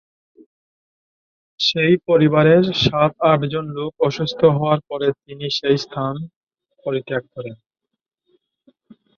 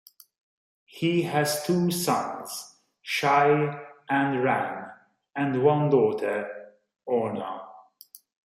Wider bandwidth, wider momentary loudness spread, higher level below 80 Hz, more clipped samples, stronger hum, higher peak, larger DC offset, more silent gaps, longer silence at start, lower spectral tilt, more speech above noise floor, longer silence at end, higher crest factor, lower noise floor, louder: second, 7.2 kHz vs 16 kHz; second, 15 LU vs 18 LU; first, -54 dBFS vs -72 dBFS; neither; neither; first, -2 dBFS vs -8 dBFS; neither; first, 6.36-6.41 s vs none; first, 1.6 s vs 0.95 s; about the same, -6.5 dB/octave vs -5.5 dB/octave; first, 47 dB vs 29 dB; first, 1.6 s vs 0.3 s; about the same, 18 dB vs 18 dB; first, -65 dBFS vs -53 dBFS; first, -18 LUFS vs -25 LUFS